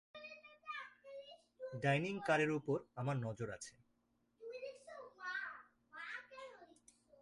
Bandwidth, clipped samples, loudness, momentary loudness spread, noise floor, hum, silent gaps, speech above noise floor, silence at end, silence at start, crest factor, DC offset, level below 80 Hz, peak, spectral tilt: 11.5 kHz; under 0.1%; -42 LUFS; 19 LU; -80 dBFS; none; none; 41 dB; 0.5 s; 0.15 s; 22 dB; under 0.1%; -78 dBFS; -22 dBFS; -6 dB/octave